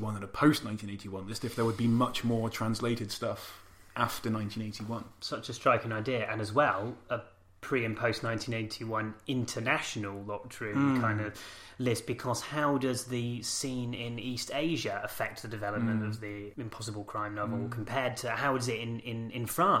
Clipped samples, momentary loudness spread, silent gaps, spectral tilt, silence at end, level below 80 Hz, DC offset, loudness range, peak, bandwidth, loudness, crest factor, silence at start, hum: under 0.1%; 11 LU; none; -5 dB/octave; 0 s; -62 dBFS; under 0.1%; 3 LU; -10 dBFS; 16 kHz; -33 LUFS; 22 dB; 0 s; none